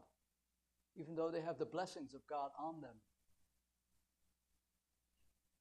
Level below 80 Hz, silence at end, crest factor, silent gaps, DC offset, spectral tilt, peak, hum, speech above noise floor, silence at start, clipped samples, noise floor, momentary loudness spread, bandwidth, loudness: -86 dBFS; 2.6 s; 22 dB; none; under 0.1%; -6 dB/octave; -30 dBFS; none; 42 dB; 0 s; under 0.1%; -88 dBFS; 13 LU; 12.5 kHz; -46 LUFS